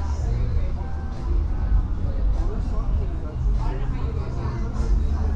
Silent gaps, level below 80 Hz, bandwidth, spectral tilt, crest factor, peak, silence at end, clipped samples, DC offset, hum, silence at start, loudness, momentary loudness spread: none; -24 dBFS; 7.2 kHz; -8.5 dB/octave; 12 dB; -10 dBFS; 0 s; under 0.1%; under 0.1%; none; 0 s; -27 LUFS; 4 LU